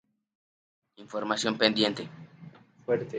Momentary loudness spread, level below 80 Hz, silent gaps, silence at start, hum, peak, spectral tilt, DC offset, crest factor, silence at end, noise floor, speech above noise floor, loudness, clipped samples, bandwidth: 21 LU; -72 dBFS; none; 1 s; none; -6 dBFS; -4 dB/octave; under 0.1%; 26 dB; 0 s; -51 dBFS; 23 dB; -28 LUFS; under 0.1%; 9.6 kHz